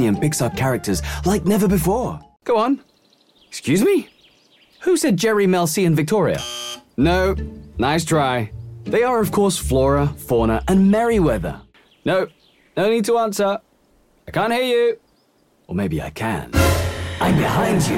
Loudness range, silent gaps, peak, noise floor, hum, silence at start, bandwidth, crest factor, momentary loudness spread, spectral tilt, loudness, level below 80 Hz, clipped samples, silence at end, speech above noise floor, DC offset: 4 LU; none; -4 dBFS; -59 dBFS; none; 0 s; 16.5 kHz; 16 dB; 11 LU; -5.5 dB/octave; -19 LUFS; -34 dBFS; under 0.1%; 0 s; 41 dB; under 0.1%